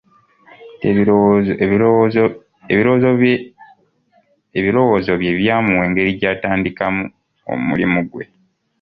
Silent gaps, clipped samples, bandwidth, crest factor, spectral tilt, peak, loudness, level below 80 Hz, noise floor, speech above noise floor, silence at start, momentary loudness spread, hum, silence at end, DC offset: none; under 0.1%; 5.4 kHz; 14 dB; -10 dB/octave; -2 dBFS; -16 LUFS; -46 dBFS; -58 dBFS; 43 dB; 0.6 s; 11 LU; none; 0.6 s; under 0.1%